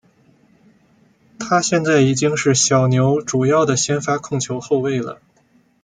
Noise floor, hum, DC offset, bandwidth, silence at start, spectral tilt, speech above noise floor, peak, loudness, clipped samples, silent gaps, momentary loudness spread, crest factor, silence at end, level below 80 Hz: -57 dBFS; none; under 0.1%; 9.6 kHz; 1.4 s; -4.5 dB/octave; 40 dB; -4 dBFS; -17 LUFS; under 0.1%; none; 9 LU; 16 dB; 0.7 s; -58 dBFS